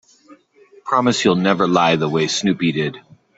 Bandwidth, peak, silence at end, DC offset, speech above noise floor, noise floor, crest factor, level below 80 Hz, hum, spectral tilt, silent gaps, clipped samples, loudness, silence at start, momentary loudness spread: 8.2 kHz; 0 dBFS; 0.4 s; under 0.1%; 33 dB; -50 dBFS; 18 dB; -58 dBFS; none; -5 dB/octave; none; under 0.1%; -17 LUFS; 0.3 s; 7 LU